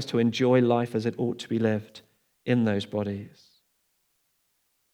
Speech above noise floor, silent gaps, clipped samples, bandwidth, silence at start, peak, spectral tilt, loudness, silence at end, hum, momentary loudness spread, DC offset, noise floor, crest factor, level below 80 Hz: 47 dB; none; under 0.1%; 11.5 kHz; 0 s; -10 dBFS; -7 dB/octave; -26 LUFS; 1.65 s; none; 16 LU; under 0.1%; -72 dBFS; 18 dB; -78 dBFS